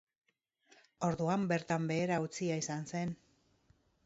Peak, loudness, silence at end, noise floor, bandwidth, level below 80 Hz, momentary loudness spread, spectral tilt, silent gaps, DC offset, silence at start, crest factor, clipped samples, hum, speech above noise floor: -18 dBFS; -36 LUFS; 0.9 s; -78 dBFS; 8 kHz; -70 dBFS; 6 LU; -6 dB/octave; none; under 0.1%; 1 s; 18 dB; under 0.1%; none; 43 dB